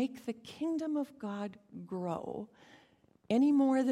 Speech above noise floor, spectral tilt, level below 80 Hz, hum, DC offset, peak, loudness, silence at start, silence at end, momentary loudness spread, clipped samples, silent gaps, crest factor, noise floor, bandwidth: 33 dB; -7 dB/octave; -76 dBFS; none; under 0.1%; -20 dBFS; -34 LUFS; 0 s; 0 s; 16 LU; under 0.1%; none; 14 dB; -66 dBFS; 11 kHz